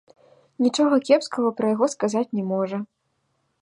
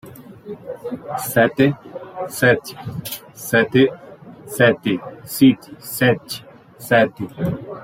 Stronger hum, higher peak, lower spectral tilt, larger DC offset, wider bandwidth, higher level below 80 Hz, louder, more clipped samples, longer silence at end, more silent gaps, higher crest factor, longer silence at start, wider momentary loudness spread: neither; second, -6 dBFS vs -2 dBFS; about the same, -5.5 dB/octave vs -5.5 dB/octave; neither; second, 11 kHz vs 16.5 kHz; second, -74 dBFS vs -56 dBFS; second, -22 LUFS vs -18 LUFS; neither; first, 0.75 s vs 0 s; neither; about the same, 18 dB vs 18 dB; first, 0.6 s vs 0.05 s; second, 8 LU vs 16 LU